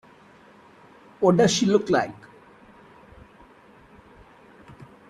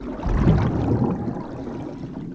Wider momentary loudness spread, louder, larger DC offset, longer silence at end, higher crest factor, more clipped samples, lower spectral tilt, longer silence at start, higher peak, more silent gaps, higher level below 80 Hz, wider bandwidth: about the same, 13 LU vs 13 LU; first, -21 LUFS vs -24 LUFS; neither; first, 2.95 s vs 0 s; first, 22 dB vs 16 dB; neither; second, -5 dB/octave vs -9.5 dB/octave; first, 1.2 s vs 0 s; about the same, -6 dBFS vs -6 dBFS; neither; second, -60 dBFS vs -30 dBFS; first, 12 kHz vs 8 kHz